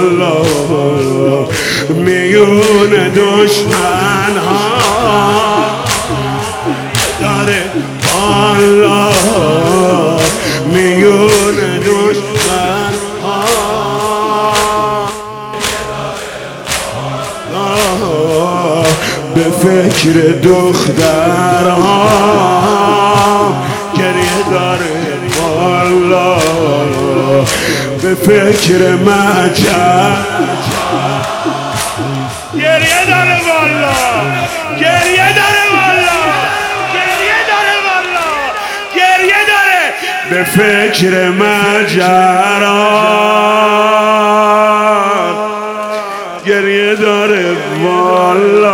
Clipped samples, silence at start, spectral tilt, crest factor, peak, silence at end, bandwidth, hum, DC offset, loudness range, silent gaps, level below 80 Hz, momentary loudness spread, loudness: 0.6%; 0 s; -4 dB/octave; 10 dB; 0 dBFS; 0 s; 17.5 kHz; none; under 0.1%; 4 LU; none; -40 dBFS; 8 LU; -10 LUFS